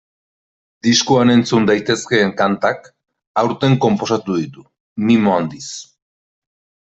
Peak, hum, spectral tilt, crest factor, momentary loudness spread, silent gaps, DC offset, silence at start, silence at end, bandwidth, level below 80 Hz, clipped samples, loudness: -2 dBFS; none; -5 dB/octave; 16 dB; 16 LU; 3.27-3.35 s, 4.80-4.96 s; under 0.1%; 0.85 s; 1.15 s; 8.2 kHz; -56 dBFS; under 0.1%; -16 LUFS